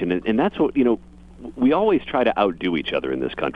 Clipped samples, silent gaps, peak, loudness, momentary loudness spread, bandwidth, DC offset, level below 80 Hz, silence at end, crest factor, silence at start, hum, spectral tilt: under 0.1%; none; -4 dBFS; -21 LUFS; 7 LU; 5.2 kHz; under 0.1%; -48 dBFS; 0 s; 18 dB; 0 s; none; -8 dB/octave